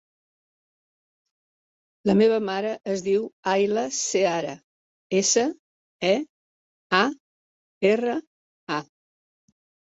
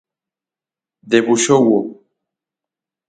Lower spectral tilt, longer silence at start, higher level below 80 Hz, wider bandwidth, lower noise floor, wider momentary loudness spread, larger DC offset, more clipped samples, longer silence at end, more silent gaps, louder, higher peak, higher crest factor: about the same, -3.5 dB/octave vs -4 dB/octave; first, 2.05 s vs 1.05 s; second, -68 dBFS vs -62 dBFS; second, 8.2 kHz vs 9.4 kHz; about the same, under -90 dBFS vs -89 dBFS; first, 11 LU vs 7 LU; neither; neither; about the same, 1.1 s vs 1.15 s; first, 3.33-3.43 s, 4.64-5.10 s, 5.59-6.00 s, 6.29-6.90 s, 7.20-7.81 s, 8.27-8.67 s vs none; second, -24 LUFS vs -14 LUFS; second, -4 dBFS vs 0 dBFS; about the same, 22 dB vs 18 dB